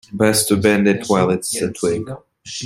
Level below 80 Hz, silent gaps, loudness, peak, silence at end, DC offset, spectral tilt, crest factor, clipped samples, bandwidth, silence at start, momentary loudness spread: -52 dBFS; none; -17 LUFS; -2 dBFS; 0 s; under 0.1%; -4.5 dB/octave; 16 dB; under 0.1%; 16 kHz; 0.1 s; 15 LU